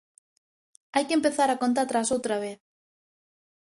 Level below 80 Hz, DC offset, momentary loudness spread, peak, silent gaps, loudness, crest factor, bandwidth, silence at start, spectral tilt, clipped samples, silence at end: -70 dBFS; under 0.1%; 7 LU; -10 dBFS; none; -26 LUFS; 18 dB; 11.5 kHz; 0.95 s; -3 dB/octave; under 0.1%; 1.2 s